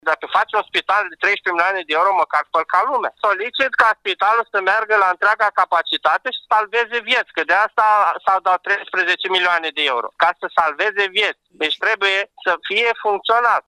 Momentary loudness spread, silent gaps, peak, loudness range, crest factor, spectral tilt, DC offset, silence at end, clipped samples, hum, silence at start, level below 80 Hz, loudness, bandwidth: 4 LU; none; -2 dBFS; 1 LU; 16 dB; -1.5 dB/octave; under 0.1%; 0.1 s; under 0.1%; none; 0.05 s; -66 dBFS; -17 LUFS; 12 kHz